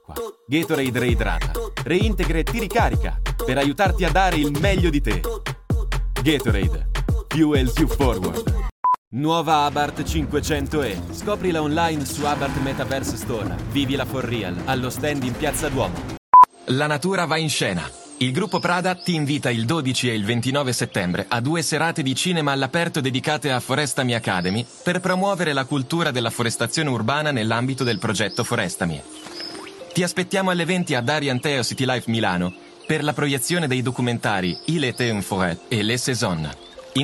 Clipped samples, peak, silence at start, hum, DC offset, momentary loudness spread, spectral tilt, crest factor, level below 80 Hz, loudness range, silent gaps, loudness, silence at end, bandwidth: under 0.1%; -2 dBFS; 0.1 s; none; under 0.1%; 7 LU; -5 dB/octave; 18 dB; -32 dBFS; 4 LU; 8.72-8.83 s, 8.98-9.11 s, 16.18-16.33 s; -22 LUFS; 0 s; 18 kHz